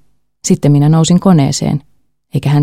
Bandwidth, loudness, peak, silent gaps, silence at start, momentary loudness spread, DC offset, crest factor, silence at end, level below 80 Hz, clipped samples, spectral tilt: 13 kHz; -11 LUFS; 0 dBFS; none; 0.45 s; 12 LU; under 0.1%; 12 dB; 0 s; -42 dBFS; under 0.1%; -6.5 dB/octave